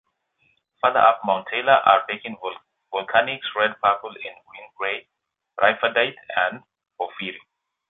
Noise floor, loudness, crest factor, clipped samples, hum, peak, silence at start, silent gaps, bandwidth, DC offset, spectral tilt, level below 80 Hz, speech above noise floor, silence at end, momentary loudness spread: -67 dBFS; -21 LUFS; 22 dB; under 0.1%; none; -2 dBFS; 0.85 s; none; 4.1 kHz; under 0.1%; -7 dB/octave; -68 dBFS; 45 dB; 0.55 s; 18 LU